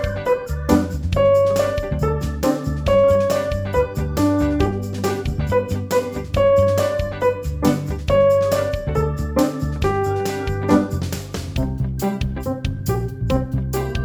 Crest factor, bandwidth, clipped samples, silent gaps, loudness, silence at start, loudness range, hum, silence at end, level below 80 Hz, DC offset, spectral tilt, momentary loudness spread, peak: 18 dB; over 20 kHz; under 0.1%; none; -20 LUFS; 0 s; 4 LU; none; 0 s; -30 dBFS; under 0.1%; -7 dB/octave; 8 LU; -2 dBFS